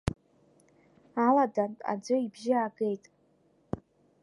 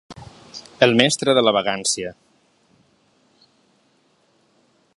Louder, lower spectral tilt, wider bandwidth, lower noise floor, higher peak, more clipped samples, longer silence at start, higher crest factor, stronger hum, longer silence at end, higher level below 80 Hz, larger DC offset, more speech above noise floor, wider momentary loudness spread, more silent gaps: second, -30 LUFS vs -18 LUFS; first, -7 dB/octave vs -3 dB/octave; about the same, 11.5 kHz vs 11.5 kHz; first, -67 dBFS vs -62 dBFS; second, -10 dBFS vs 0 dBFS; neither; about the same, 0.05 s vs 0.1 s; about the same, 22 dB vs 24 dB; neither; second, 0.45 s vs 2.85 s; about the same, -56 dBFS vs -60 dBFS; neither; second, 37 dB vs 43 dB; second, 16 LU vs 23 LU; neither